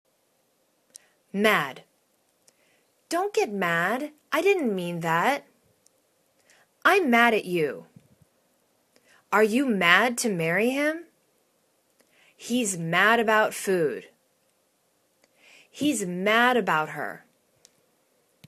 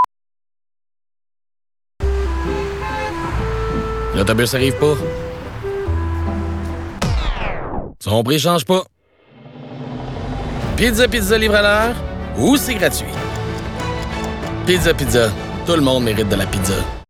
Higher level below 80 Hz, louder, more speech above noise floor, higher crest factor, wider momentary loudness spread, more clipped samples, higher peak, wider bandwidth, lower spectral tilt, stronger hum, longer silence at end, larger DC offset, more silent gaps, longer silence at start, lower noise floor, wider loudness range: second, -74 dBFS vs -28 dBFS; second, -24 LUFS vs -18 LUFS; first, 46 dB vs 33 dB; first, 24 dB vs 16 dB; about the same, 13 LU vs 12 LU; neither; about the same, -2 dBFS vs -2 dBFS; second, 14 kHz vs 18 kHz; about the same, -4 dB/octave vs -5 dB/octave; neither; first, 1.3 s vs 0.05 s; neither; neither; first, 1.35 s vs 0 s; first, -69 dBFS vs -48 dBFS; second, 3 LU vs 7 LU